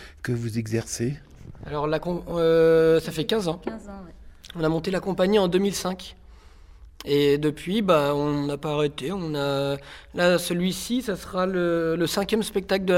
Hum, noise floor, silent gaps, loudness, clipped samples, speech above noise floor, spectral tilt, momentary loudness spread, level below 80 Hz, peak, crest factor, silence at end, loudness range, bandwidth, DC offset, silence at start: none; -48 dBFS; none; -24 LUFS; under 0.1%; 24 dB; -5.5 dB/octave; 13 LU; -48 dBFS; -6 dBFS; 18 dB; 0 s; 2 LU; 16.5 kHz; under 0.1%; 0 s